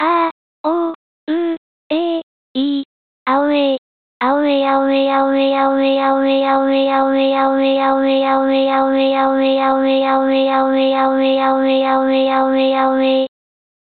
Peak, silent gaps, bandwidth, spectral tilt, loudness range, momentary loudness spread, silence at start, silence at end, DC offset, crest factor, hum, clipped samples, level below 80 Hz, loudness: -4 dBFS; 0.31-0.64 s, 0.95-1.27 s, 1.57-1.90 s, 2.23-2.55 s, 2.85-3.26 s, 3.78-4.20 s; 4.6 kHz; -8 dB/octave; 5 LU; 8 LU; 0 s; 0.65 s; 0.2%; 12 dB; none; under 0.1%; -62 dBFS; -15 LUFS